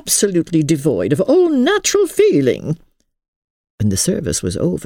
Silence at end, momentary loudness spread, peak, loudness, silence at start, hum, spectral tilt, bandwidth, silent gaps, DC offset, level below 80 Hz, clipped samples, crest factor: 0 s; 7 LU; -2 dBFS; -16 LUFS; 0.05 s; none; -4.5 dB/octave; 17 kHz; 3.28-3.64 s, 3.70-3.78 s; under 0.1%; -44 dBFS; under 0.1%; 14 dB